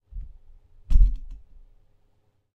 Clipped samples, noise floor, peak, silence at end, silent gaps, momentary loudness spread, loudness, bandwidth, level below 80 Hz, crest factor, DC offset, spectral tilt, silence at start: under 0.1%; -65 dBFS; -4 dBFS; 1.2 s; none; 24 LU; -26 LUFS; 1.1 kHz; -26 dBFS; 20 dB; under 0.1%; -8 dB/octave; 0.15 s